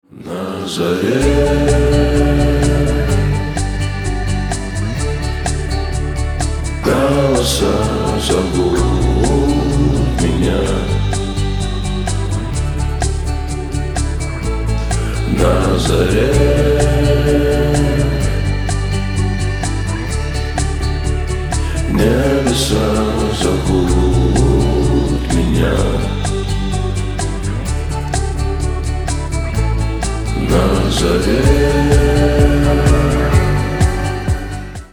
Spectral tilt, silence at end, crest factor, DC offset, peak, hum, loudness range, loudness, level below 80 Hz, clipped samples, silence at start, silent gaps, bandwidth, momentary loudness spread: -6 dB/octave; 0.05 s; 14 dB; under 0.1%; 0 dBFS; none; 6 LU; -16 LUFS; -20 dBFS; under 0.1%; 0.15 s; none; 15.5 kHz; 7 LU